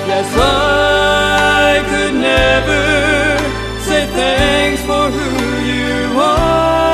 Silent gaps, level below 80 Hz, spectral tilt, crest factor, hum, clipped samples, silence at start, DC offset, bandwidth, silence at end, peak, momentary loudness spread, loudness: none; -26 dBFS; -4 dB/octave; 12 dB; none; under 0.1%; 0 s; under 0.1%; 14 kHz; 0 s; -2 dBFS; 5 LU; -12 LUFS